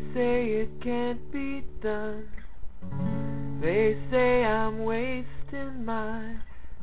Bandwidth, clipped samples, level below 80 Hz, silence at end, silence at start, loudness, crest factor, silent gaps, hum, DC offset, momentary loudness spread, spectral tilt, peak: 4 kHz; under 0.1%; -44 dBFS; 0 s; 0 s; -29 LUFS; 16 dB; none; none; 3%; 16 LU; -10.5 dB/octave; -12 dBFS